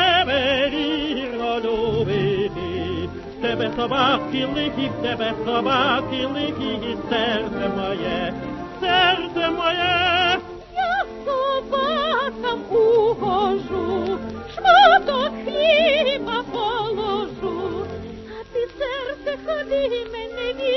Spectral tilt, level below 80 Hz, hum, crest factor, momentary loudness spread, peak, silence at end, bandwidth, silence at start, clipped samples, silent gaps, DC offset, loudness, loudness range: -5.5 dB/octave; -46 dBFS; none; 18 dB; 11 LU; -2 dBFS; 0 s; 6.2 kHz; 0 s; under 0.1%; none; under 0.1%; -21 LUFS; 7 LU